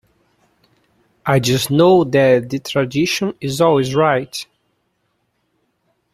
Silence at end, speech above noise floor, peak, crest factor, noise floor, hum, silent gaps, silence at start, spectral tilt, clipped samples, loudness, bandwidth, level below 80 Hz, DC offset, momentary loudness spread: 1.7 s; 52 dB; -2 dBFS; 16 dB; -68 dBFS; none; none; 1.25 s; -5.5 dB/octave; under 0.1%; -16 LUFS; 16 kHz; -54 dBFS; under 0.1%; 12 LU